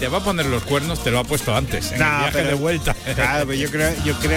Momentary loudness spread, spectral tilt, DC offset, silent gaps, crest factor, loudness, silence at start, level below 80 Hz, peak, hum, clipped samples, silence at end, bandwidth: 3 LU; -4.5 dB/octave; under 0.1%; none; 14 dB; -20 LUFS; 0 s; -32 dBFS; -6 dBFS; none; under 0.1%; 0 s; 17 kHz